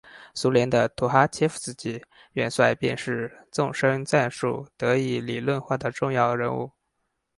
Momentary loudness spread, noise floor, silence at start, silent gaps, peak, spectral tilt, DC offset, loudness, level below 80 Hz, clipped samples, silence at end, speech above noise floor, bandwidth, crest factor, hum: 11 LU; -77 dBFS; 0.05 s; none; -2 dBFS; -5.5 dB/octave; under 0.1%; -25 LUFS; -60 dBFS; under 0.1%; 0.7 s; 52 dB; 11.5 kHz; 22 dB; none